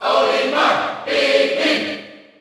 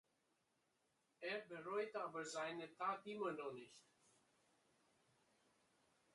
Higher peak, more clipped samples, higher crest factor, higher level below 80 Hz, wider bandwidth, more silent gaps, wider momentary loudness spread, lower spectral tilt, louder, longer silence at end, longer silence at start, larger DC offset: first, -2 dBFS vs -32 dBFS; neither; about the same, 16 dB vs 20 dB; first, -68 dBFS vs under -90 dBFS; first, 12.5 kHz vs 11 kHz; neither; about the same, 6 LU vs 8 LU; about the same, -2.5 dB/octave vs -3.5 dB/octave; first, -17 LUFS vs -48 LUFS; second, 0.25 s vs 2.35 s; second, 0 s vs 1.2 s; neither